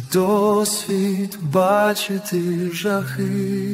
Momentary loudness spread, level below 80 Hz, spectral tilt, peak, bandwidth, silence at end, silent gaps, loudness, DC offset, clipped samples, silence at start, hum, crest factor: 6 LU; -60 dBFS; -5 dB/octave; -4 dBFS; 16 kHz; 0 s; none; -20 LUFS; under 0.1%; under 0.1%; 0 s; none; 14 dB